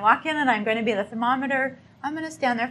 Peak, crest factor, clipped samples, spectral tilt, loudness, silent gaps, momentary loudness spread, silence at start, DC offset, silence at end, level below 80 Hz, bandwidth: -4 dBFS; 20 dB; under 0.1%; -4.5 dB/octave; -24 LUFS; none; 10 LU; 0 s; under 0.1%; 0 s; -68 dBFS; 12 kHz